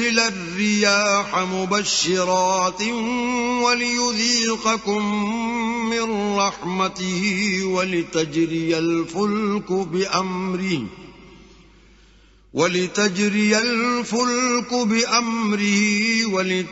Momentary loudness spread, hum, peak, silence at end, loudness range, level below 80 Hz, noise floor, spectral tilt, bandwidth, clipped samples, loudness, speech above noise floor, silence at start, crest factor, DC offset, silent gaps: 5 LU; none; -2 dBFS; 0 s; 5 LU; -54 dBFS; -52 dBFS; -3 dB/octave; 8 kHz; under 0.1%; -20 LUFS; 31 dB; 0 s; 20 dB; under 0.1%; none